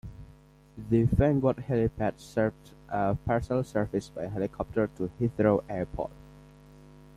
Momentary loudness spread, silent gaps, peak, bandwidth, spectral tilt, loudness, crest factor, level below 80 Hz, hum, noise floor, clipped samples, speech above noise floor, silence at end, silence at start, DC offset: 11 LU; none; -10 dBFS; 13 kHz; -8.5 dB/octave; -29 LUFS; 20 dB; -46 dBFS; 50 Hz at -50 dBFS; -55 dBFS; under 0.1%; 27 dB; 0.75 s; 0.05 s; under 0.1%